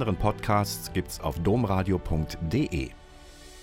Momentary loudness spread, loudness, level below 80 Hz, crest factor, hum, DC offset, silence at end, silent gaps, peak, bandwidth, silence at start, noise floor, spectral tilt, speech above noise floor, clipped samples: 8 LU; -28 LUFS; -40 dBFS; 18 dB; none; under 0.1%; 0 s; none; -10 dBFS; 16.5 kHz; 0 s; -48 dBFS; -6 dB/octave; 21 dB; under 0.1%